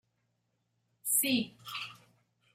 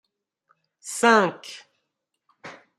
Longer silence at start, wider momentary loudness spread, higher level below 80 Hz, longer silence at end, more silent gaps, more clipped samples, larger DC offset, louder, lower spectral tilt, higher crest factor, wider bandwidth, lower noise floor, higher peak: first, 1.05 s vs 0.85 s; second, 14 LU vs 26 LU; about the same, -80 dBFS vs -78 dBFS; first, 0.6 s vs 0.25 s; neither; neither; neither; second, -32 LUFS vs -20 LUFS; second, -1.5 dB/octave vs -3.5 dB/octave; about the same, 22 dB vs 24 dB; first, 16 kHz vs 14.5 kHz; about the same, -79 dBFS vs -80 dBFS; second, -16 dBFS vs -2 dBFS